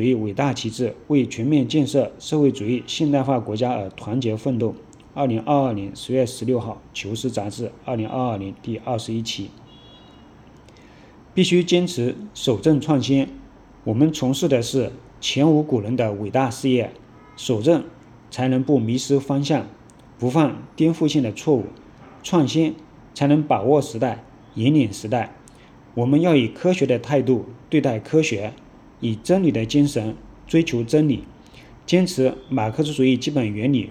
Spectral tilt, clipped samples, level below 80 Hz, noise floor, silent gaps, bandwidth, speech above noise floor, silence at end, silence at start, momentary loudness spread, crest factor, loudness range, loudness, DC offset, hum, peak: -6 dB/octave; under 0.1%; -54 dBFS; -47 dBFS; none; 14.5 kHz; 26 dB; 0 s; 0 s; 11 LU; 18 dB; 5 LU; -21 LUFS; under 0.1%; none; -4 dBFS